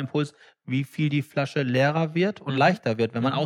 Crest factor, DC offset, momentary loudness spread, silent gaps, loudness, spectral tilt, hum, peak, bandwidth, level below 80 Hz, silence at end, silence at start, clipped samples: 16 dB; under 0.1%; 7 LU; none; -25 LUFS; -7 dB/octave; none; -8 dBFS; 13.5 kHz; -72 dBFS; 0 s; 0 s; under 0.1%